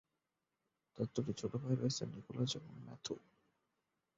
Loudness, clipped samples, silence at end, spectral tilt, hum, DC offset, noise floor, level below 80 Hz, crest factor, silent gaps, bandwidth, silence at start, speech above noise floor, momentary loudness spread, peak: -42 LUFS; under 0.1%; 1 s; -7 dB/octave; none; under 0.1%; -89 dBFS; -74 dBFS; 20 dB; none; 7.6 kHz; 0.95 s; 48 dB; 10 LU; -22 dBFS